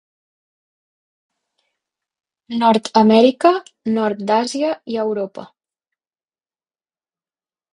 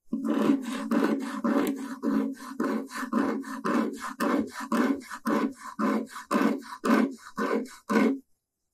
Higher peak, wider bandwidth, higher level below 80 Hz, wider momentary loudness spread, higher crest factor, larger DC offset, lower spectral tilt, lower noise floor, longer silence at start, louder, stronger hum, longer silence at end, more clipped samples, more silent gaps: first, 0 dBFS vs -8 dBFS; second, 11 kHz vs 15.5 kHz; first, -66 dBFS vs -72 dBFS; first, 13 LU vs 7 LU; about the same, 20 dB vs 20 dB; neither; about the same, -5.5 dB/octave vs -5.5 dB/octave; first, under -90 dBFS vs -73 dBFS; first, 2.5 s vs 0.05 s; first, -17 LUFS vs -28 LUFS; neither; first, 2.3 s vs 0.55 s; neither; neither